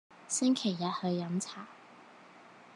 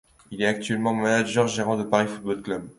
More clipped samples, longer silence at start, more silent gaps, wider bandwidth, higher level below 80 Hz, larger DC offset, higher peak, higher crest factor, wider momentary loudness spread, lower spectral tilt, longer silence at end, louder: neither; second, 0.1 s vs 0.3 s; neither; about the same, 11.5 kHz vs 11.5 kHz; second, -88 dBFS vs -60 dBFS; neither; second, -18 dBFS vs -4 dBFS; about the same, 18 dB vs 20 dB; first, 19 LU vs 8 LU; about the same, -4.5 dB/octave vs -5 dB/octave; about the same, 0 s vs 0.05 s; second, -33 LUFS vs -24 LUFS